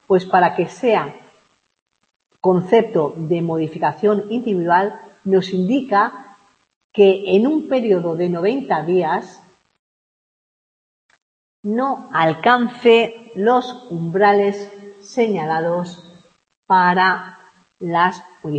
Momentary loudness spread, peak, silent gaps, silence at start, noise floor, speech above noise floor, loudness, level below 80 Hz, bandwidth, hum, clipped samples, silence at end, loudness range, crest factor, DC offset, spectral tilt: 11 LU; -2 dBFS; 1.82-1.86 s, 6.76-6.90 s, 9.79-11.09 s, 11.22-11.63 s, 16.57-16.63 s; 0.1 s; -59 dBFS; 42 dB; -18 LUFS; -68 dBFS; 8.6 kHz; none; under 0.1%; 0 s; 5 LU; 18 dB; under 0.1%; -7 dB/octave